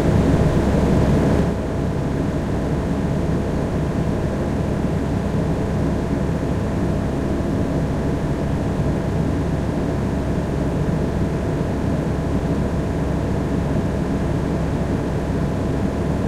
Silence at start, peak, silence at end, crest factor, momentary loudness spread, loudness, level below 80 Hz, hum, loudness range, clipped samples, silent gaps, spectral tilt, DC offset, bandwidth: 0 s; -4 dBFS; 0 s; 16 dB; 5 LU; -21 LUFS; -28 dBFS; none; 2 LU; under 0.1%; none; -8 dB/octave; under 0.1%; 13.5 kHz